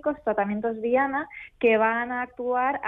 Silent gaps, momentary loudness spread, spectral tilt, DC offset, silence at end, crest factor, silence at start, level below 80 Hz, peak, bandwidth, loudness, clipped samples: none; 9 LU; -8.5 dB/octave; under 0.1%; 0 s; 14 dB; 0.05 s; -60 dBFS; -10 dBFS; 3.9 kHz; -25 LUFS; under 0.1%